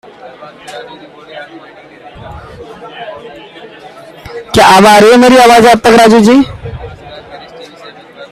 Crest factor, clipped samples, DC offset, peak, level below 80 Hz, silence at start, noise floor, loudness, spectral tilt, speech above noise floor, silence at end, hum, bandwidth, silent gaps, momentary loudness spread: 10 dB; 2%; under 0.1%; 0 dBFS; -38 dBFS; 0.4 s; -33 dBFS; -4 LUFS; -4.5 dB/octave; 27 dB; 0.05 s; none; 18.5 kHz; none; 26 LU